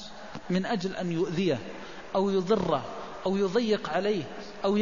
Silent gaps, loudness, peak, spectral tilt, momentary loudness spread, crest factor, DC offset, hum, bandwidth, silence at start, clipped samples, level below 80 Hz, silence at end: none; -29 LUFS; -12 dBFS; -6.5 dB/octave; 13 LU; 16 dB; 0.5%; none; 7.4 kHz; 0 s; under 0.1%; -58 dBFS; 0 s